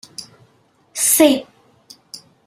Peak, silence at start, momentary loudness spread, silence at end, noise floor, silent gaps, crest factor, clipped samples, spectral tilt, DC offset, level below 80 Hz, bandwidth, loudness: -2 dBFS; 0.2 s; 25 LU; 0.3 s; -57 dBFS; none; 20 dB; under 0.1%; -1.5 dB/octave; under 0.1%; -64 dBFS; 16 kHz; -14 LUFS